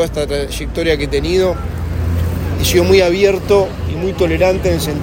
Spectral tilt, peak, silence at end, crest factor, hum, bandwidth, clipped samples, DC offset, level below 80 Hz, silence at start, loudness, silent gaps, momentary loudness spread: -5.5 dB/octave; 0 dBFS; 0 s; 14 dB; none; 16.5 kHz; under 0.1%; under 0.1%; -26 dBFS; 0 s; -15 LUFS; none; 9 LU